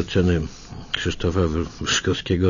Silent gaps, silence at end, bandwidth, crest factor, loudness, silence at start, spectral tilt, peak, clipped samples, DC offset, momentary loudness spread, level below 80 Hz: none; 0 s; 7.4 kHz; 16 dB; -23 LUFS; 0 s; -5 dB/octave; -6 dBFS; under 0.1%; under 0.1%; 8 LU; -36 dBFS